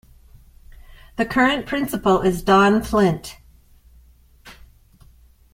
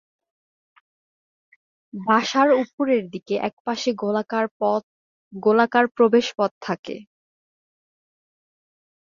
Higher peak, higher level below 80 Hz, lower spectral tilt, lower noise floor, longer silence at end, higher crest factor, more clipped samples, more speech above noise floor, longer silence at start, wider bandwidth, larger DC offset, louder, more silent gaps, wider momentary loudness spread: about the same, -4 dBFS vs -4 dBFS; first, -42 dBFS vs -72 dBFS; about the same, -5.5 dB/octave vs -5 dB/octave; second, -51 dBFS vs under -90 dBFS; second, 1 s vs 2.05 s; about the same, 18 dB vs 20 dB; neither; second, 33 dB vs over 69 dB; second, 0.9 s vs 1.95 s; first, 16.5 kHz vs 7.4 kHz; neither; about the same, -19 LUFS vs -21 LUFS; second, none vs 2.73-2.78 s, 3.53-3.65 s, 4.51-4.60 s, 4.83-5.31 s, 6.51-6.61 s, 6.79-6.83 s; about the same, 13 LU vs 12 LU